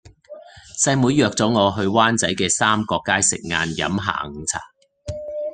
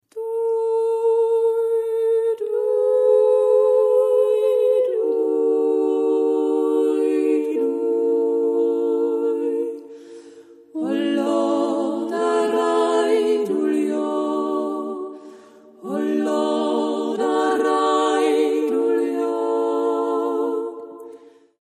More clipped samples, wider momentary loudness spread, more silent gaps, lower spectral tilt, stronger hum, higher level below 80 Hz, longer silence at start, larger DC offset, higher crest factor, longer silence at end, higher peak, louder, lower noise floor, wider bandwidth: neither; first, 13 LU vs 9 LU; neither; second, -3.5 dB/octave vs -5 dB/octave; neither; first, -52 dBFS vs -78 dBFS; first, 0.3 s vs 0.15 s; neither; first, 20 dB vs 12 dB; second, 0 s vs 0.45 s; first, -2 dBFS vs -8 dBFS; about the same, -19 LUFS vs -20 LUFS; second, -42 dBFS vs -46 dBFS; second, 10.5 kHz vs 12.5 kHz